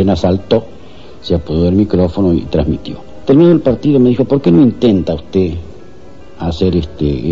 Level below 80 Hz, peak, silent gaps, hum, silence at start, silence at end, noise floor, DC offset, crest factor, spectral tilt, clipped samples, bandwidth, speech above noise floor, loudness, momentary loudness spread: -30 dBFS; -2 dBFS; none; none; 0 s; 0 s; -37 dBFS; 3%; 12 dB; -9 dB/octave; under 0.1%; 7.4 kHz; 26 dB; -13 LUFS; 12 LU